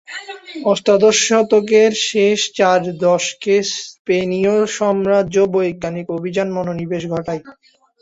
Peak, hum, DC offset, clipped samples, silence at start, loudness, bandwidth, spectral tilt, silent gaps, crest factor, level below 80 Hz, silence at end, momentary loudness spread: -2 dBFS; none; under 0.1%; under 0.1%; 0.1 s; -16 LUFS; 8 kHz; -4 dB/octave; 3.99-4.05 s; 14 dB; -56 dBFS; 0.5 s; 11 LU